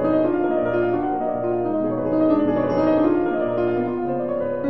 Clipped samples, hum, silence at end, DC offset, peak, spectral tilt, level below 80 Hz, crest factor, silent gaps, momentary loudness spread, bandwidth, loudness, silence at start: under 0.1%; none; 0 s; 0.7%; -6 dBFS; -10 dB/octave; -50 dBFS; 14 dB; none; 5 LU; 5.8 kHz; -21 LUFS; 0 s